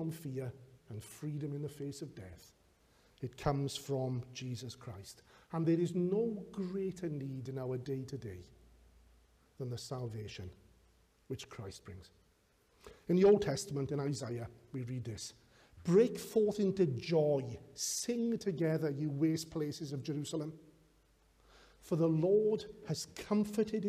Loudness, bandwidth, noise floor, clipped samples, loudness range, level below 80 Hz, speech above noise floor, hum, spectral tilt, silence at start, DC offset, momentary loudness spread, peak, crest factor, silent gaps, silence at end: -36 LUFS; 15.5 kHz; -71 dBFS; under 0.1%; 13 LU; -66 dBFS; 36 dB; none; -6 dB/octave; 0 s; under 0.1%; 17 LU; -18 dBFS; 20 dB; none; 0 s